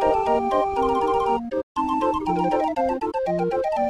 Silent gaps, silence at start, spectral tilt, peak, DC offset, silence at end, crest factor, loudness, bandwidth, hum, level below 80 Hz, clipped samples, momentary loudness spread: 1.63-1.75 s; 0 s; -7 dB/octave; -6 dBFS; under 0.1%; 0 s; 16 dB; -23 LUFS; 12 kHz; none; -46 dBFS; under 0.1%; 4 LU